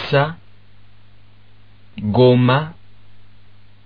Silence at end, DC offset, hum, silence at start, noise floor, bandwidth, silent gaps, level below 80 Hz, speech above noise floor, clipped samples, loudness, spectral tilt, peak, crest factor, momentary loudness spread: 1.15 s; 0.9%; 50 Hz at -45 dBFS; 0 s; -50 dBFS; 5.2 kHz; none; -52 dBFS; 35 dB; under 0.1%; -16 LUFS; -6 dB/octave; -2 dBFS; 18 dB; 24 LU